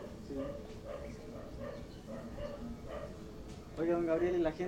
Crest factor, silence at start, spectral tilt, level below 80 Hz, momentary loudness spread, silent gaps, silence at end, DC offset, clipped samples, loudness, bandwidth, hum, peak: 18 dB; 0 s; -7 dB/octave; -52 dBFS; 15 LU; none; 0 s; under 0.1%; under 0.1%; -40 LUFS; 15.5 kHz; none; -20 dBFS